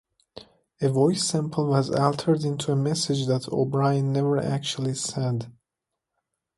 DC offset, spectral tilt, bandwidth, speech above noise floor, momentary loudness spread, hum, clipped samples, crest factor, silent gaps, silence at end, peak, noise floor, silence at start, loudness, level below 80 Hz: under 0.1%; -6 dB/octave; 11.5 kHz; 61 dB; 6 LU; none; under 0.1%; 18 dB; none; 1.05 s; -6 dBFS; -85 dBFS; 0.35 s; -25 LUFS; -62 dBFS